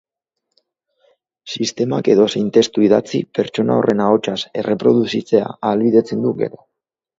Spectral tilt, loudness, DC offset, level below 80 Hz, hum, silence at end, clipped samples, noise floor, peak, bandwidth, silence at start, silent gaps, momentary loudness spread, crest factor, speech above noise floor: -6 dB/octave; -17 LUFS; under 0.1%; -60 dBFS; none; 0.7 s; under 0.1%; -77 dBFS; 0 dBFS; 7.8 kHz; 1.45 s; none; 8 LU; 18 dB; 61 dB